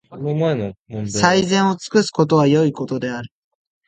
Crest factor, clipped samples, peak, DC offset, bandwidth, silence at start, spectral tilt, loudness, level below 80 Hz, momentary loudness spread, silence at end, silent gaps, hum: 18 dB; under 0.1%; 0 dBFS; under 0.1%; 9.4 kHz; 0.1 s; -5.5 dB/octave; -18 LUFS; -54 dBFS; 13 LU; 0.6 s; 0.79-0.85 s; none